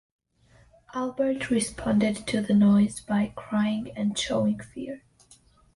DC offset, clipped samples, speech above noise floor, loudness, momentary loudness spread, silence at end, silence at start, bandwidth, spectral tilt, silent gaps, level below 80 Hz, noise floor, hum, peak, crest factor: under 0.1%; under 0.1%; 34 dB; -26 LUFS; 16 LU; 0.75 s; 0.95 s; 11.5 kHz; -5.5 dB/octave; none; -54 dBFS; -59 dBFS; none; -12 dBFS; 14 dB